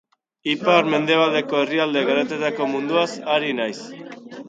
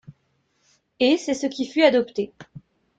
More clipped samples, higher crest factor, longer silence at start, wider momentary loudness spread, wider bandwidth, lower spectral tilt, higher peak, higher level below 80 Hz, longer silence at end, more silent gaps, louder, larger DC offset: neither; about the same, 20 dB vs 20 dB; first, 0.45 s vs 0.1 s; about the same, 13 LU vs 11 LU; about the same, 9 kHz vs 9.4 kHz; about the same, -5 dB/octave vs -4 dB/octave; about the same, -2 dBFS vs -4 dBFS; second, -72 dBFS vs -66 dBFS; second, 0 s vs 0.4 s; neither; about the same, -20 LUFS vs -22 LUFS; neither